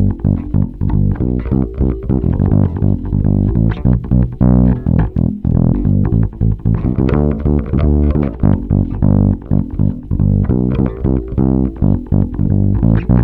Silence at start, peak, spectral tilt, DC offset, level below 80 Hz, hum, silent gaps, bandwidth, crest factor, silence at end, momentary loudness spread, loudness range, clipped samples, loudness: 0 s; 0 dBFS; -12.5 dB/octave; under 0.1%; -20 dBFS; none; none; 3.8 kHz; 12 dB; 0 s; 4 LU; 1 LU; under 0.1%; -15 LUFS